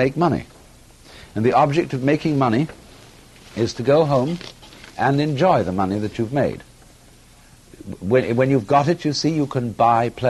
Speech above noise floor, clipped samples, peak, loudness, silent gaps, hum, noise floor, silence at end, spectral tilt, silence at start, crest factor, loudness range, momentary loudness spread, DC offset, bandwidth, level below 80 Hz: 29 dB; under 0.1%; -4 dBFS; -20 LUFS; none; none; -48 dBFS; 0 s; -6.5 dB/octave; 0 s; 16 dB; 2 LU; 14 LU; under 0.1%; 12.5 kHz; -50 dBFS